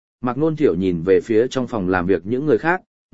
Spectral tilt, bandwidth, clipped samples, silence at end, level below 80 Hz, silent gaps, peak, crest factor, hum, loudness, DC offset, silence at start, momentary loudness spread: -7.5 dB/octave; 8 kHz; under 0.1%; 0 s; -50 dBFS; 2.87-3.09 s; -2 dBFS; 18 dB; none; -19 LUFS; 0.9%; 0.2 s; 5 LU